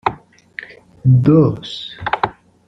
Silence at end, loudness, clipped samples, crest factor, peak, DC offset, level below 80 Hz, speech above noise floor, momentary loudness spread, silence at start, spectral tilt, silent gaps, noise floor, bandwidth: 0.35 s; -16 LUFS; under 0.1%; 16 dB; 0 dBFS; under 0.1%; -48 dBFS; 23 dB; 22 LU; 0.05 s; -8.5 dB/octave; none; -36 dBFS; 6.2 kHz